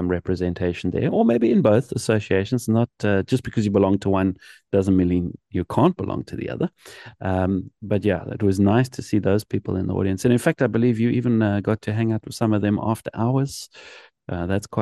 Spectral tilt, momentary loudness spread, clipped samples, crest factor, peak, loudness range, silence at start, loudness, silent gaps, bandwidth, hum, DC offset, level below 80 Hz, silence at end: -7.5 dB/octave; 9 LU; under 0.1%; 18 dB; -2 dBFS; 3 LU; 0 s; -22 LUFS; none; 12.5 kHz; none; under 0.1%; -54 dBFS; 0 s